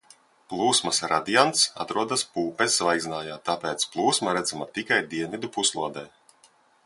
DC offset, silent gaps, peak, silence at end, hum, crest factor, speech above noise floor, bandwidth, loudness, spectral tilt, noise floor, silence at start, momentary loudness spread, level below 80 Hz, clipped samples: under 0.1%; none; -2 dBFS; 0.8 s; none; 24 dB; 34 dB; 11.5 kHz; -24 LUFS; -2 dB/octave; -60 dBFS; 0.5 s; 11 LU; -66 dBFS; under 0.1%